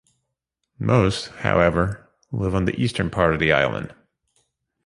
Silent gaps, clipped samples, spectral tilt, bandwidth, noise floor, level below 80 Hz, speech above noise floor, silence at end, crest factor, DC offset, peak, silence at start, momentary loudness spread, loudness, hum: none; under 0.1%; -6.5 dB/octave; 11.5 kHz; -79 dBFS; -40 dBFS; 59 dB; 0.95 s; 22 dB; under 0.1%; 0 dBFS; 0.8 s; 13 LU; -21 LUFS; none